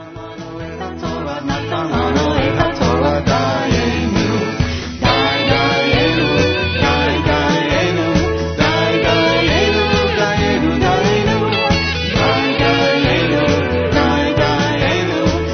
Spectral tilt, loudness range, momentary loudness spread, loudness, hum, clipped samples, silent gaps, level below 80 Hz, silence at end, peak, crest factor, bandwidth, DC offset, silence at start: -4 dB/octave; 2 LU; 7 LU; -15 LUFS; none; under 0.1%; none; -30 dBFS; 0 s; 0 dBFS; 14 dB; 6.6 kHz; under 0.1%; 0 s